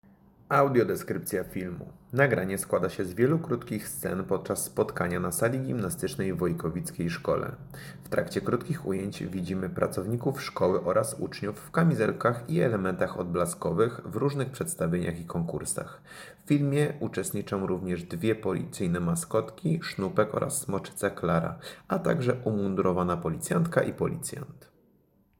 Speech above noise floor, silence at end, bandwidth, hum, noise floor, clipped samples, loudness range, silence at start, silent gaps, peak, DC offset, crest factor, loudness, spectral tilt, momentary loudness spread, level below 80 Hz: 37 dB; 0.75 s; 17 kHz; none; -65 dBFS; under 0.1%; 3 LU; 0.5 s; none; -8 dBFS; under 0.1%; 22 dB; -29 LUFS; -6 dB/octave; 8 LU; -56 dBFS